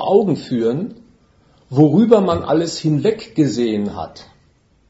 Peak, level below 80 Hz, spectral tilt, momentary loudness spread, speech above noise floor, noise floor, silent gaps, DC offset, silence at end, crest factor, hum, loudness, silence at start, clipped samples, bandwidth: 0 dBFS; -52 dBFS; -7 dB/octave; 13 LU; 40 dB; -56 dBFS; none; under 0.1%; 0.65 s; 18 dB; none; -17 LUFS; 0 s; under 0.1%; 8 kHz